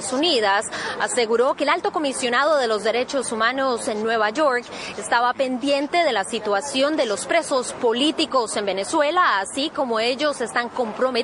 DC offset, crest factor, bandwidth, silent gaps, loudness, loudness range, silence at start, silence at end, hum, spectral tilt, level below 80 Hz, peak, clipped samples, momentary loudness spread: under 0.1%; 16 dB; 11 kHz; none; -21 LUFS; 1 LU; 0 s; 0 s; none; -2 dB/octave; -64 dBFS; -4 dBFS; under 0.1%; 5 LU